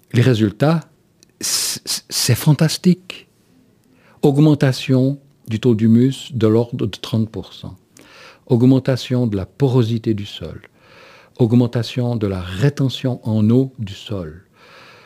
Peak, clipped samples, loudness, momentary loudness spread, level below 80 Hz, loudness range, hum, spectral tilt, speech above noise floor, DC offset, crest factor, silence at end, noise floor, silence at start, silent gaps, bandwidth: 0 dBFS; under 0.1%; -17 LUFS; 15 LU; -52 dBFS; 3 LU; none; -6 dB/octave; 38 dB; under 0.1%; 16 dB; 0.65 s; -54 dBFS; 0.15 s; none; 16 kHz